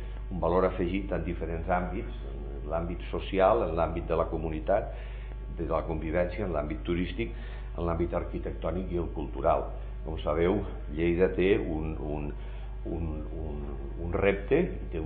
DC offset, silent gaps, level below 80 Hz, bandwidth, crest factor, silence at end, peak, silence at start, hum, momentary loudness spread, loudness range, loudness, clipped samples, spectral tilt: under 0.1%; none; -36 dBFS; 4.5 kHz; 20 dB; 0 s; -10 dBFS; 0 s; none; 13 LU; 3 LU; -31 LUFS; under 0.1%; -6.5 dB/octave